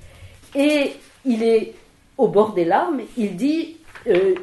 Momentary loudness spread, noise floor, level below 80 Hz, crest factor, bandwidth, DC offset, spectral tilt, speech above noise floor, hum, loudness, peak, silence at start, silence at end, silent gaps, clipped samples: 12 LU; -43 dBFS; -54 dBFS; 18 dB; 12 kHz; under 0.1%; -6 dB/octave; 25 dB; none; -20 LUFS; -4 dBFS; 0.05 s; 0 s; none; under 0.1%